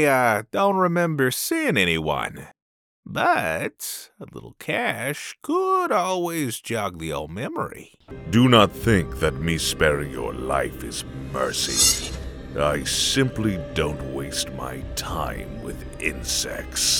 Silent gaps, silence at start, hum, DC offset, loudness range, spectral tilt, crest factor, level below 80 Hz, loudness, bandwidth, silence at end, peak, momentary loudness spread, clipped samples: 2.62-3.03 s; 0 s; none; under 0.1%; 5 LU; -3.5 dB/octave; 22 dB; -40 dBFS; -23 LUFS; over 20 kHz; 0 s; 0 dBFS; 14 LU; under 0.1%